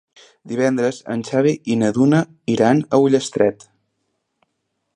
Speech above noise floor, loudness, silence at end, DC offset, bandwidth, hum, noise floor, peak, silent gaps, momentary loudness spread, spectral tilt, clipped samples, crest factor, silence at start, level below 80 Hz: 56 dB; -18 LUFS; 1.4 s; under 0.1%; 10.5 kHz; none; -74 dBFS; -2 dBFS; none; 6 LU; -6.5 dB/octave; under 0.1%; 18 dB; 0.45 s; -62 dBFS